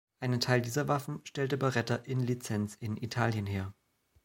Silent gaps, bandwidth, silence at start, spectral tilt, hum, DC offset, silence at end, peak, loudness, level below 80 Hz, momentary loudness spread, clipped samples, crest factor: none; 16.5 kHz; 0.2 s; -5.5 dB/octave; none; under 0.1%; 0.55 s; -12 dBFS; -33 LUFS; -68 dBFS; 8 LU; under 0.1%; 22 dB